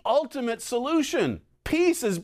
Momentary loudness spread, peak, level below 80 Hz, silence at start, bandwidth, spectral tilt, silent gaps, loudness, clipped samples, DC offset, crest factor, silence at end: 7 LU; -10 dBFS; -50 dBFS; 0.05 s; 16 kHz; -4.5 dB/octave; none; -26 LUFS; under 0.1%; under 0.1%; 14 dB; 0 s